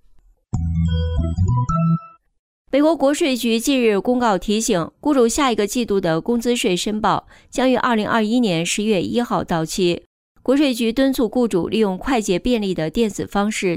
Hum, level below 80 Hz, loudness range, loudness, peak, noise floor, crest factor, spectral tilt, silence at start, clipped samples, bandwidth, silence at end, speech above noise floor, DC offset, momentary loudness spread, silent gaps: none; -38 dBFS; 1 LU; -19 LUFS; -6 dBFS; -51 dBFS; 12 dB; -5 dB/octave; 0.55 s; under 0.1%; 16 kHz; 0 s; 33 dB; under 0.1%; 5 LU; 2.39-2.65 s, 10.06-10.35 s